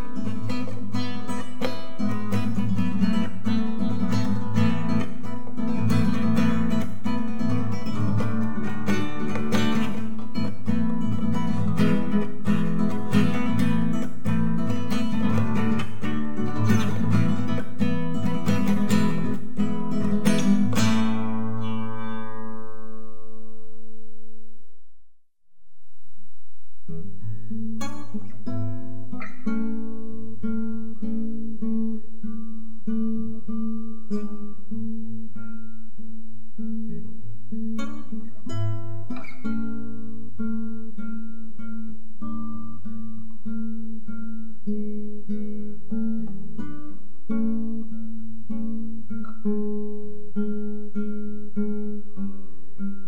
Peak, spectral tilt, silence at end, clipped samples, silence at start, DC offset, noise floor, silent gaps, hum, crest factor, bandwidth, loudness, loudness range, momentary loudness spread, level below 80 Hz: -6 dBFS; -7 dB/octave; 0 s; under 0.1%; 0 s; 10%; -61 dBFS; none; none; 20 dB; 16 kHz; -28 LUFS; 12 LU; 15 LU; -62 dBFS